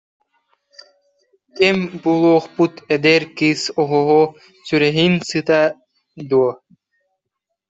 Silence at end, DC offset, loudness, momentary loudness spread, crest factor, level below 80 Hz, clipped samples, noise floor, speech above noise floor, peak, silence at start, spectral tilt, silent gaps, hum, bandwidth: 1.15 s; under 0.1%; -16 LUFS; 6 LU; 16 dB; -60 dBFS; under 0.1%; -78 dBFS; 62 dB; -2 dBFS; 1.55 s; -5.5 dB/octave; none; none; 8 kHz